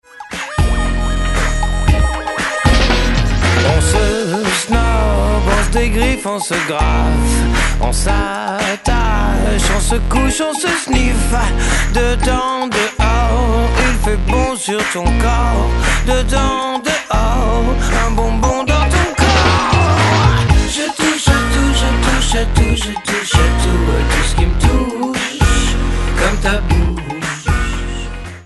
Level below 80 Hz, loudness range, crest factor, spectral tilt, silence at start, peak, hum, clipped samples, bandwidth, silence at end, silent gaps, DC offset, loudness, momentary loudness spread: -16 dBFS; 3 LU; 14 dB; -4.5 dB/octave; 0.15 s; 0 dBFS; none; under 0.1%; 12 kHz; 0 s; none; under 0.1%; -15 LUFS; 5 LU